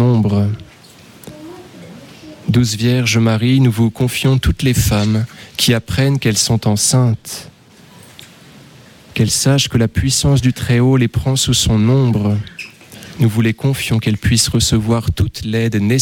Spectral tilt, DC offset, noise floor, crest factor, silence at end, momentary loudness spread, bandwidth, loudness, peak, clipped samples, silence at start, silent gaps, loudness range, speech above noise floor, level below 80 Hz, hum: -5 dB/octave; under 0.1%; -43 dBFS; 14 dB; 0 s; 14 LU; 17 kHz; -14 LUFS; -2 dBFS; under 0.1%; 0 s; none; 4 LU; 29 dB; -32 dBFS; none